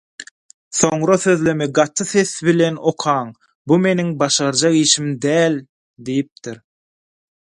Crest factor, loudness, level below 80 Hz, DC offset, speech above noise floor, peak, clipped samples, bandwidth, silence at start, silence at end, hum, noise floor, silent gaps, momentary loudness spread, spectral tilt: 18 dB; -17 LUFS; -60 dBFS; under 0.1%; over 73 dB; 0 dBFS; under 0.1%; 11.5 kHz; 0.2 s; 1 s; none; under -90 dBFS; 0.31-0.71 s, 3.55-3.65 s, 5.69-5.94 s, 6.32-6.36 s; 17 LU; -4 dB/octave